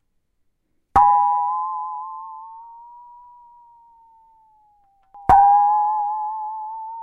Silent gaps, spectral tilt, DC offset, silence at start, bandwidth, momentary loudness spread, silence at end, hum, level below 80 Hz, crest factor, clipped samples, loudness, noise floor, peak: none; -6.5 dB/octave; under 0.1%; 0.95 s; 4.4 kHz; 22 LU; 0 s; none; -46 dBFS; 20 dB; under 0.1%; -18 LUFS; -68 dBFS; 0 dBFS